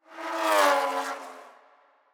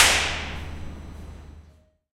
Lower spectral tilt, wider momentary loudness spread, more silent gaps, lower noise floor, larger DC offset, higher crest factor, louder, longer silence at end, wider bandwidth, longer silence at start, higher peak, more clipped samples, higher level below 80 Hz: second, 1 dB/octave vs -1 dB/octave; second, 17 LU vs 24 LU; neither; first, -61 dBFS vs -55 dBFS; neither; second, 20 dB vs 26 dB; about the same, -25 LUFS vs -24 LUFS; first, 0.65 s vs 0.45 s; first, over 20 kHz vs 16 kHz; about the same, 0.1 s vs 0 s; second, -10 dBFS vs 0 dBFS; neither; second, under -90 dBFS vs -40 dBFS